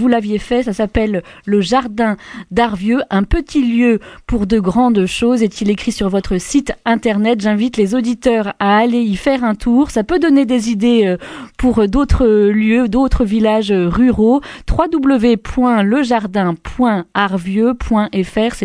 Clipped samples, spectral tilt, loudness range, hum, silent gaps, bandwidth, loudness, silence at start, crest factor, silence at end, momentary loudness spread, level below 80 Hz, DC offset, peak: under 0.1%; -6 dB/octave; 2 LU; none; none; 11 kHz; -14 LUFS; 0 s; 14 dB; 0 s; 5 LU; -28 dBFS; under 0.1%; 0 dBFS